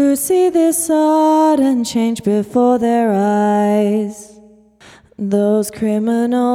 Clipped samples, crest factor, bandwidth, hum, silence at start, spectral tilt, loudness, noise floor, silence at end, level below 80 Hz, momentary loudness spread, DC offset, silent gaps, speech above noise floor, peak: under 0.1%; 12 dB; 16.5 kHz; none; 0 s; -5.5 dB/octave; -15 LUFS; -45 dBFS; 0 s; -56 dBFS; 6 LU; under 0.1%; none; 31 dB; -2 dBFS